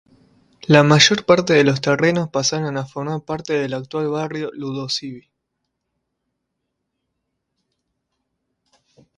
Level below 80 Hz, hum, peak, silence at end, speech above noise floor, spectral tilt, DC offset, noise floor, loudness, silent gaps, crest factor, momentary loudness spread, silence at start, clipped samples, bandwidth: -60 dBFS; none; 0 dBFS; 4 s; 59 dB; -4.5 dB/octave; under 0.1%; -77 dBFS; -18 LUFS; none; 20 dB; 14 LU; 0.7 s; under 0.1%; 11 kHz